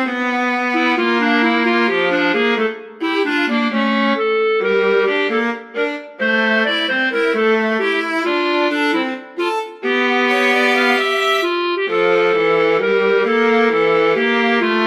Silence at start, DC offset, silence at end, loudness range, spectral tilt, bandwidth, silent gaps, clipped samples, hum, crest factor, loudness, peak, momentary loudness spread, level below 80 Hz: 0 s; under 0.1%; 0 s; 2 LU; -4.5 dB/octave; 14.5 kHz; none; under 0.1%; none; 14 dB; -16 LUFS; -2 dBFS; 7 LU; -70 dBFS